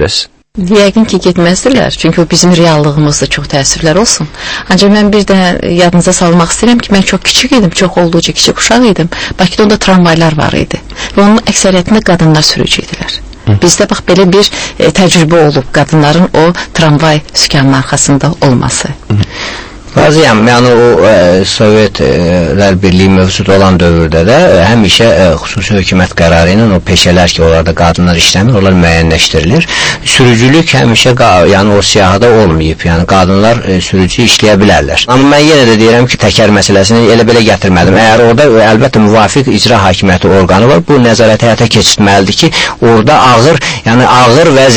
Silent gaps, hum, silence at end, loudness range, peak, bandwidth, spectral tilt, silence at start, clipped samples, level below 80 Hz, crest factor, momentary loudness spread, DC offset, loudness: none; none; 0 s; 3 LU; 0 dBFS; 11 kHz; -4.5 dB/octave; 0 s; 5%; -26 dBFS; 6 dB; 6 LU; under 0.1%; -6 LUFS